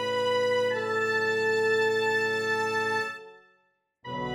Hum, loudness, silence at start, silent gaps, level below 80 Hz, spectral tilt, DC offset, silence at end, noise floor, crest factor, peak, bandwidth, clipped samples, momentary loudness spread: none; -26 LUFS; 0 s; none; -70 dBFS; -3.5 dB/octave; under 0.1%; 0 s; -71 dBFS; 12 dB; -16 dBFS; 18.5 kHz; under 0.1%; 11 LU